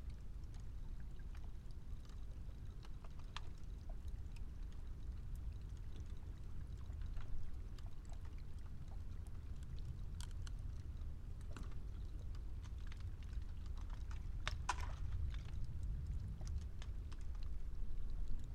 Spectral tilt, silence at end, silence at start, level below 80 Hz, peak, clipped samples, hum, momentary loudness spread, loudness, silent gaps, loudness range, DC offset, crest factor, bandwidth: -5.5 dB/octave; 0 s; 0 s; -48 dBFS; -22 dBFS; under 0.1%; none; 7 LU; -51 LUFS; none; 6 LU; under 0.1%; 22 dB; 10.5 kHz